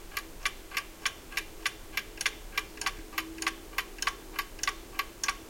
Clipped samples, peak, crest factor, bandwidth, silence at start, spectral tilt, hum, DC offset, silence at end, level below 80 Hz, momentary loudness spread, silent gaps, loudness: under 0.1%; -12 dBFS; 24 dB; 17 kHz; 0 s; -0.5 dB/octave; none; under 0.1%; 0 s; -50 dBFS; 5 LU; none; -35 LUFS